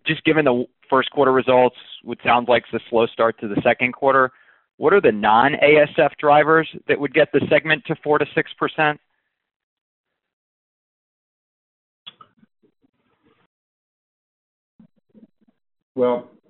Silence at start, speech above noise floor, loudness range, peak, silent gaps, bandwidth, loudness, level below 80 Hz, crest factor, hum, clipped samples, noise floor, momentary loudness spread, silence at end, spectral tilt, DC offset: 0.05 s; 45 dB; 11 LU; -2 dBFS; 4.73-4.78 s, 9.56-10.04 s, 10.33-12.06 s, 12.89-12.93 s, 13.46-14.79 s, 15.82-15.95 s; 4.2 kHz; -18 LUFS; -60 dBFS; 18 dB; none; under 0.1%; -63 dBFS; 8 LU; 0.25 s; -3 dB/octave; under 0.1%